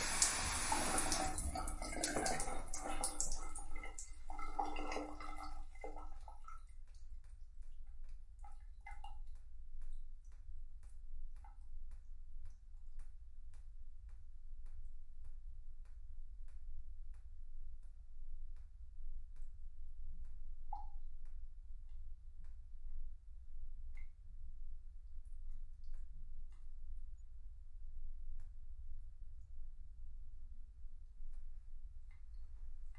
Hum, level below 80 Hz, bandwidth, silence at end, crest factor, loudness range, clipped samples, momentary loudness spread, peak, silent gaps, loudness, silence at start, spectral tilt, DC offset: none; -48 dBFS; 11.5 kHz; 0 s; 32 dB; 16 LU; under 0.1%; 20 LU; -12 dBFS; none; -45 LUFS; 0 s; -2 dB/octave; under 0.1%